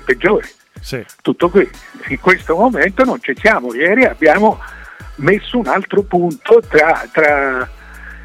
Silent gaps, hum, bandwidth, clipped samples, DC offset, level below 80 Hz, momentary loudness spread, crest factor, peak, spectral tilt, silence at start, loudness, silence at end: none; none; 15 kHz; under 0.1%; under 0.1%; -38 dBFS; 16 LU; 14 dB; 0 dBFS; -6 dB/octave; 0.05 s; -13 LUFS; 0 s